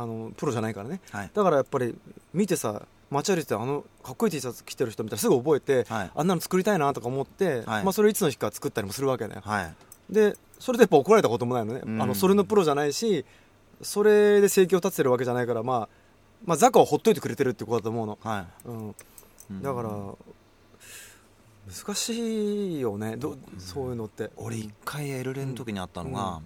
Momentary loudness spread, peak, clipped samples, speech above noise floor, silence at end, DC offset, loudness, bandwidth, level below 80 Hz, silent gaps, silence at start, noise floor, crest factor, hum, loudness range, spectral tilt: 16 LU; -2 dBFS; under 0.1%; 30 dB; 0 s; under 0.1%; -26 LUFS; 17.5 kHz; -60 dBFS; none; 0 s; -56 dBFS; 24 dB; none; 11 LU; -5 dB/octave